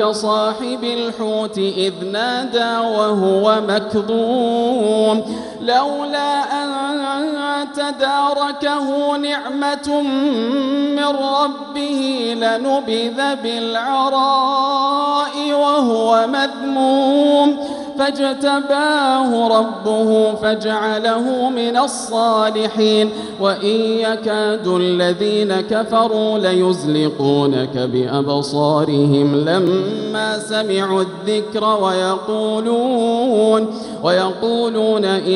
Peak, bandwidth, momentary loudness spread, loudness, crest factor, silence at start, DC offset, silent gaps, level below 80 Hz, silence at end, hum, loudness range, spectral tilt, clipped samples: -2 dBFS; 11.5 kHz; 6 LU; -17 LUFS; 14 dB; 0 s; under 0.1%; none; -62 dBFS; 0 s; none; 3 LU; -5 dB/octave; under 0.1%